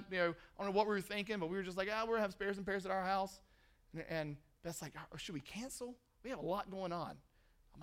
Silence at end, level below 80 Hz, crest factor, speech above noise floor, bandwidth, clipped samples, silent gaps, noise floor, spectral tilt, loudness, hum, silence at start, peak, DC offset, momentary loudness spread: 0 s; -66 dBFS; 22 dB; 27 dB; 16 kHz; under 0.1%; none; -68 dBFS; -4.5 dB/octave; -41 LUFS; none; 0 s; -20 dBFS; under 0.1%; 13 LU